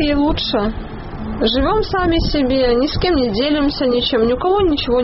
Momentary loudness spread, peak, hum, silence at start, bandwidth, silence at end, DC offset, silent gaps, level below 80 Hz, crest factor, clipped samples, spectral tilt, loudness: 6 LU; -4 dBFS; none; 0 s; 6 kHz; 0 s; under 0.1%; none; -28 dBFS; 12 dB; under 0.1%; -4 dB/octave; -16 LUFS